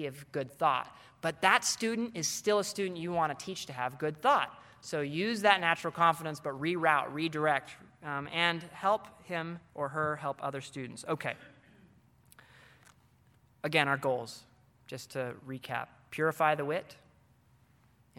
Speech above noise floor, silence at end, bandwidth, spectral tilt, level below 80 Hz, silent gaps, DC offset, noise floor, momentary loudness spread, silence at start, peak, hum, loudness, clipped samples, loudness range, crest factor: 33 dB; 1.25 s; 17 kHz; -3.5 dB/octave; -74 dBFS; none; under 0.1%; -66 dBFS; 14 LU; 0 s; -8 dBFS; none; -32 LUFS; under 0.1%; 8 LU; 26 dB